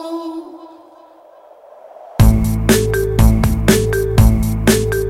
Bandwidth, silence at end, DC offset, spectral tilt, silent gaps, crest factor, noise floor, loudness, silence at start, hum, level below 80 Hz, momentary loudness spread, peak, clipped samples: 16.5 kHz; 0 s; under 0.1%; -6 dB/octave; none; 14 dB; -43 dBFS; -14 LUFS; 0 s; none; -20 dBFS; 14 LU; 0 dBFS; under 0.1%